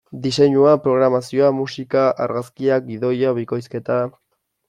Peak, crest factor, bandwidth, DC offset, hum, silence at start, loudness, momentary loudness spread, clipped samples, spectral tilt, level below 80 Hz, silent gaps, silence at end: -2 dBFS; 16 dB; 12 kHz; under 0.1%; none; 0.1 s; -18 LUFS; 10 LU; under 0.1%; -6.5 dB/octave; -60 dBFS; none; 0.6 s